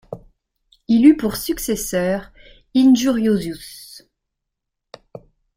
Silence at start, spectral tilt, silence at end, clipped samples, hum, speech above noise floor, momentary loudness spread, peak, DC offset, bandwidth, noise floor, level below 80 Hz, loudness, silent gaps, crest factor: 0.1 s; -5 dB/octave; 1.6 s; under 0.1%; none; 63 dB; 24 LU; -2 dBFS; under 0.1%; 16 kHz; -80 dBFS; -48 dBFS; -17 LUFS; none; 18 dB